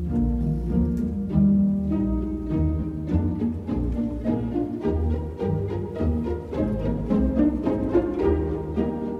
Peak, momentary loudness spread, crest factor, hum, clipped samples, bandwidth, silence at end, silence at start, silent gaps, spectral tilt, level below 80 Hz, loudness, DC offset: -8 dBFS; 6 LU; 14 dB; none; under 0.1%; 6 kHz; 0 s; 0 s; none; -10.5 dB/octave; -32 dBFS; -25 LUFS; under 0.1%